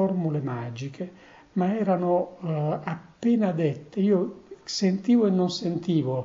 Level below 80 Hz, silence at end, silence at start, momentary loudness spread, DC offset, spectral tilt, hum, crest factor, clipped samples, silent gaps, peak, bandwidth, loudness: -68 dBFS; 0 s; 0 s; 13 LU; under 0.1%; -7 dB/octave; none; 14 dB; under 0.1%; none; -12 dBFS; 7.8 kHz; -26 LUFS